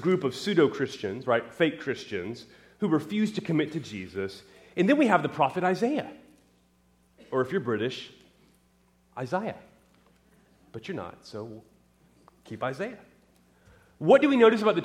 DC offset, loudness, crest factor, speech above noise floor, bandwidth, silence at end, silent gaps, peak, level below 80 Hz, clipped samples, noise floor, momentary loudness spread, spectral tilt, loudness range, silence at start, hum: under 0.1%; -27 LUFS; 22 dB; 38 dB; 14 kHz; 0 s; none; -6 dBFS; -70 dBFS; under 0.1%; -65 dBFS; 20 LU; -6.5 dB/octave; 12 LU; 0 s; none